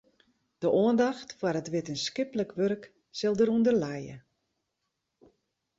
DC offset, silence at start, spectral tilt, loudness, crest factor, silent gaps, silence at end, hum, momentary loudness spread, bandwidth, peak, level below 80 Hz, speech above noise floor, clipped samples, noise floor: under 0.1%; 0.6 s; -5.5 dB/octave; -29 LUFS; 16 dB; none; 1.6 s; none; 12 LU; 7.8 kHz; -14 dBFS; -68 dBFS; 55 dB; under 0.1%; -82 dBFS